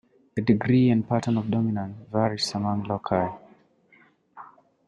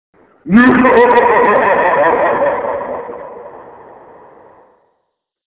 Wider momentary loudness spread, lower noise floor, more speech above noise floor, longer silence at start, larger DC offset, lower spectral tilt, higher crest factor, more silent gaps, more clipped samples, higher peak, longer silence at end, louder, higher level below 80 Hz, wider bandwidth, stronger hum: second, 11 LU vs 20 LU; second, -59 dBFS vs -70 dBFS; second, 36 dB vs 60 dB; about the same, 0.35 s vs 0.45 s; neither; second, -7 dB/octave vs -10 dB/octave; first, 20 dB vs 14 dB; neither; neither; second, -6 dBFS vs 0 dBFS; second, 0.4 s vs 1.85 s; second, -25 LUFS vs -10 LUFS; second, -60 dBFS vs -46 dBFS; first, 11 kHz vs 4 kHz; neither